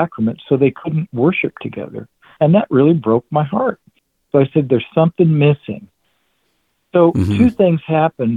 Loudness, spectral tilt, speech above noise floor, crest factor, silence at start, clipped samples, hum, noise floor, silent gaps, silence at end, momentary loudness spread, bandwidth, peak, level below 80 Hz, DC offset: -15 LUFS; -9.5 dB/octave; 51 dB; 16 dB; 0 s; under 0.1%; none; -66 dBFS; none; 0 s; 11 LU; 7.2 kHz; 0 dBFS; -48 dBFS; under 0.1%